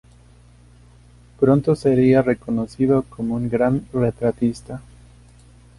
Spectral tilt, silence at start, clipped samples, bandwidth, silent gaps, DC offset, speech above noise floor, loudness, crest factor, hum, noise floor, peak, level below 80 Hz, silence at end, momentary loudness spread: -8.5 dB/octave; 1.4 s; under 0.1%; 11.5 kHz; none; under 0.1%; 30 dB; -19 LUFS; 18 dB; 60 Hz at -35 dBFS; -49 dBFS; -4 dBFS; -46 dBFS; 1 s; 10 LU